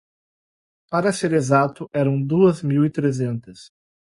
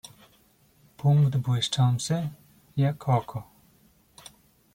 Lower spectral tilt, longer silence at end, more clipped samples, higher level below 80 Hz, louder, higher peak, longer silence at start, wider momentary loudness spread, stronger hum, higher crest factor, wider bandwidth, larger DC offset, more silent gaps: about the same, -7 dB/octave vs -6 dB/octave; second, 0.5 s vs 1.35 s; neither; about the same, -60 dBFS vs -62 dBFS; first, -20 LUFS vs -26 LUFS; first, -4 dBFS vs -8 dBFS; about the same, 0.9 s vs 1 s; second, 8 LU vs 15 LU; neither; about the same, 18 dB vs 18 dB; second, 11.5 kHz vs 16 kHz; neither; neither